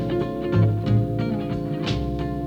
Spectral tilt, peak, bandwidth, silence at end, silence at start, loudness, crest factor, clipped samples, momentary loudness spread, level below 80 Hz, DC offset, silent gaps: -8.5 dB/octave; -8 dBFS; 7 kHz; 0 s; 0 s; -24 LUFS; 16 dB; under 0.1%; 6 LU; -36 dBFS; under 0.1%; none